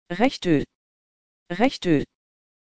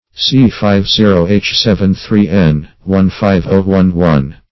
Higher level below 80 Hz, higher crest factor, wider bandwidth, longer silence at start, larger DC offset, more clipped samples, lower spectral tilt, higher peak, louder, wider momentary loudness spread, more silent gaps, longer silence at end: second, -52 dBFS vs -28 dBFS; first, 20 dB vs 10 dB; first, 9.2 kHz vs 6 kHz; about the same, 0.05 s vs 0.15 s; second, under 0.1% vs 1%; second, under 0.1% vs 0.3%; about the same, -6.5 dB/octave vs -7 dB/octave; second, -4 dBFS vs 0 dBFS; second, -23 LUFS vs -11 LUFS; first, 16 LU vs 4 LU; first, 0.75-1.46 s vs none; first, 0.6 s vs 0.2 s